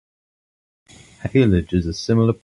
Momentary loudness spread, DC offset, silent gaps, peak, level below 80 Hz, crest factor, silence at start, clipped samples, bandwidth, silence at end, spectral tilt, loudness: 6 LU; under 0.1%; none; -4 dBFS; -36 dBFS; 18 dB; 1.25 s; under 0.1%; 11 kHz; 0.1 s; -7.5 dB/octave; -19 LUFS